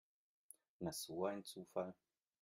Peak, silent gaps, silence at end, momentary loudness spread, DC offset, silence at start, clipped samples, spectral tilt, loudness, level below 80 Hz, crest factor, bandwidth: -26 dBFS; none; 0.5 s; 20 LU; under 0.1%; 0.8 s; under 0.1%; -4.5 dB/octave; -47 LUFS; -82 dBFS; 22 dB; 16 kHz